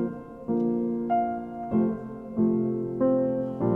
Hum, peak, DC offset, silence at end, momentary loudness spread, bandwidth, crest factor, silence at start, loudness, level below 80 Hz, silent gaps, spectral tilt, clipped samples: none; -12 dBFS; under 0.1%; 0 s; 9 LU; 3.1 kHz; 16 dB; 0 s; -27 LUFS; -56 dBFS; none; -11.5 dB/octave; under 0.1%